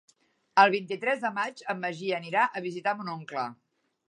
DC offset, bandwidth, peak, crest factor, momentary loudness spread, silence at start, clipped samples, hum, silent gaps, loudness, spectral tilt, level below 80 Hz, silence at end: under 0.1%; 11 kHz; -6 dBFS; 24 dB; 13 LU; 0.55 s; under 0.1%; none; none; -28 LUFS; -5 dB/octave; -84 dBFS; 0.55 s